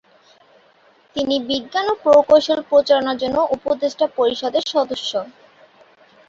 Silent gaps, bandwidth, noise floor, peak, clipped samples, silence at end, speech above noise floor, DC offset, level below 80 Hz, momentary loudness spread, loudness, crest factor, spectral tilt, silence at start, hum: none; 7.6 kHz; -54 dBFS; -2 dBFS; under 0.1%; 1 s; 36 dB; under 0.1%; -56 dBFS; 10 LU; -18 LUFS; 18 dB; -3.5 dB/octave; 1.15 s; none